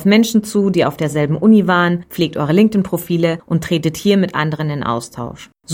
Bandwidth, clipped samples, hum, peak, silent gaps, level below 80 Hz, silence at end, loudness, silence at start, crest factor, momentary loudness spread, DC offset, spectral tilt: 17 kHz; under 0.1%; none; 0 dBFS; none; -48 dBFS; 0 s; -16 LUFS; 0 s; 14 dB; 9 LU; under 0.1%; -6 dB/octave